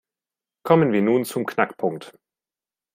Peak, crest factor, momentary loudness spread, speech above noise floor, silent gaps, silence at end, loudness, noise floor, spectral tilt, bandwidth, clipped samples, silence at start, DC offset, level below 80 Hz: -2 dBFS; 22 dB; 14 LU; over 69 dB; none; 0.85 s; -21 LUFS; under -90 dBFS; -6.5 dB/octave; 16 kHz; under 0.1%; 0.65 s; under 0.1%; -66 dBFS